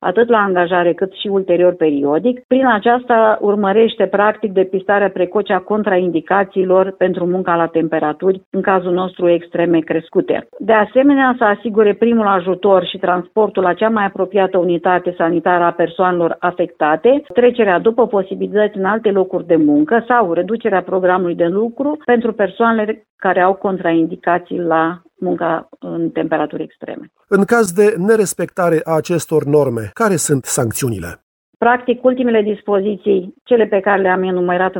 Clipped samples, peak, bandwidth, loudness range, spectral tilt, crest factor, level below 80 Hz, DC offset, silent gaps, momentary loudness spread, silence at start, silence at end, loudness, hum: under 0.1%; 0 dBFS; 17 kHz; 3 LU; -5.5 dB/octave; 14 dB; -56 dBFS; under 0.1%; 2.44-2.49 s, 8.46-8.52 s, 23.10-23.18 s, 31.22-31.60 s, 33.41-33.45 s; 6 LU; 0 s; 0 s; -15 LUFS; none